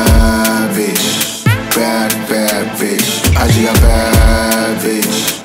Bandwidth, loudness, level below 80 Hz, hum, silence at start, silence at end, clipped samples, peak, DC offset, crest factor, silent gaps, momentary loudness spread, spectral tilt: 16.5 kHz; -12 LUFS; -16 dBFS; none; 0 s; 0 s; under 0.1%; 0 dBFS; under 0.1%; 12 dB; none; 4 LU; -4 dB/octave